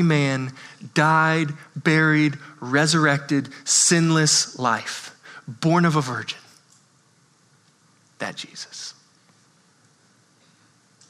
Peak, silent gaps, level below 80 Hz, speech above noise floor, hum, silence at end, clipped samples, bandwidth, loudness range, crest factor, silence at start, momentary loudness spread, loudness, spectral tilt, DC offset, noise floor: -4 dBFS; none; -74 dBFS; 38 dB; none; 2.2 s; under 0.1%; 13.5 kHz; 19 LU; 20 dB; 0 s; 18 LU; -20 LUFS; -3.5 dB/octave; under 0.1%; -59 dBFS